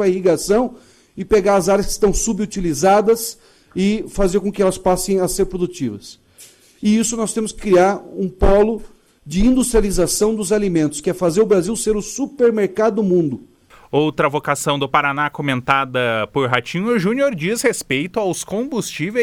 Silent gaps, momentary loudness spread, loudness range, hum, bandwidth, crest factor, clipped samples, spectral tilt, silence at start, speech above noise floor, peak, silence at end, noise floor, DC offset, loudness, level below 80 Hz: none; 8 LU; 2 LU; none; 16.5 kHz; 18 dB; under 0.1%; -4.5 dB/octave; 0 s; 29 dB; 0 dBFS; 0 s; -46 dBFS; under 0.1%; -18 LUFS; -32 dBFS